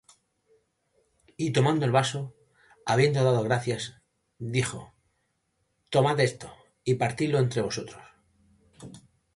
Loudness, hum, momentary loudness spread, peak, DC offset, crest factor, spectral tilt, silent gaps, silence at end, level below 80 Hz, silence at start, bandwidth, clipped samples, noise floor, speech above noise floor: -26 LUFS; none; 20 LU; -10 dBFS; under 0.1%; 20 dB; -5.5 dB/octave; none; 0.35 s; -62 dBFS; 1.4 s; 11.5 kHz; under 0.1%; -75 dBFS; 50 dB